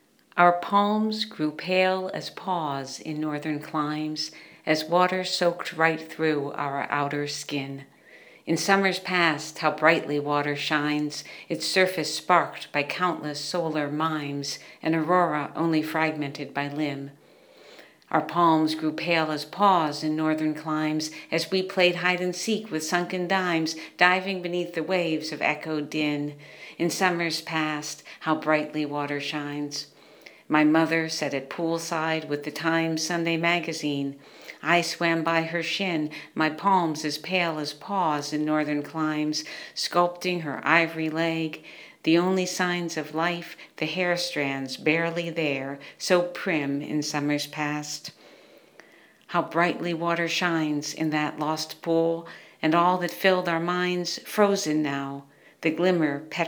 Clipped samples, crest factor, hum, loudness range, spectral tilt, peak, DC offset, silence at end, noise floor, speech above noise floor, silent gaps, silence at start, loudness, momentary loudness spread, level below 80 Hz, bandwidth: under 0.1%; 24 dB; none; 3 LU; -4.5 dB/octave; -2 dBFS; under 0.1%; 0 s; -54 dBFS; 29 dB; none; 0.35 s; -26 LUFS; 10 LU; -80 dBFS; 19.5 kHz